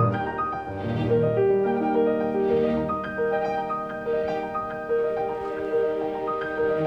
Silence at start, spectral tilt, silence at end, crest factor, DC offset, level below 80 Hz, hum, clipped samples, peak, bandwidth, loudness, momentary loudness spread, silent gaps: 0 s; -9 dB/octave; 0 s; 16 dB; under 0.1%; -52 dBFS; none; under 0.1%; -10 dBFS; 6 kHz; -25 LUFS; 7 LU; none